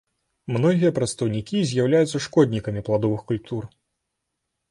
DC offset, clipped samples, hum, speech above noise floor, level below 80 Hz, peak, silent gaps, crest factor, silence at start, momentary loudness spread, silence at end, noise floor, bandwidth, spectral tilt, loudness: under 0.1%; under 0.1%; none; 58 dB; -54 dBFS; -6 dBFS; none; 18 dB; 0.5 s; 11 LU; 1.05 s; -79 dBFS; 11.5 kHz; -6.5 dB/octave; -23 LUFS